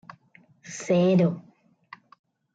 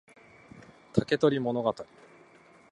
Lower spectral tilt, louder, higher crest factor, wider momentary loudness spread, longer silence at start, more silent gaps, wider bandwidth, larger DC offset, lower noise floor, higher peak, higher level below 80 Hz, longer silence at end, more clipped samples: about the same, -7 dB/octave vs -7 dB/octave; first, -23 LUFS vs -28 LUFS; second, 16 dB vs 24 dB; first, 19 LU vs 15 LU; about the same, 0.65 s vs 0.55 s; neither; second, 8 kHz vs 10.5 kHz; neither; about the same, -58 dBFS vs -57 dBFS; second, -12 dBFS vs -8 dBFS; second, -72 dBFS vs -62 dBFS; first, 1.15 s vs 0.9 s; neither